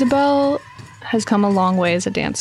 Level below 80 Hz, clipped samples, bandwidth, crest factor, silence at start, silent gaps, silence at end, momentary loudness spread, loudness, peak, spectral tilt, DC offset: -50 dBFS; under 0.1%; 11.5 kHz; 14 dB; 0 s; none; 0 s; 8 LU; -18 LUFS; -4 dBFS; -5.5 dB/octave; under 0.1%